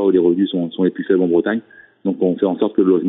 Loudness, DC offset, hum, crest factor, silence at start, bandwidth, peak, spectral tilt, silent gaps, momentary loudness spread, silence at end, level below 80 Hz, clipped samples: -18 LUFS; under 0.1%; none; 14 dB; 0 s; 4 kHz; -4 dBFS; -6.5 dB/octave; none; 8 LU; 0 s; -62 dBFS; under 0.1%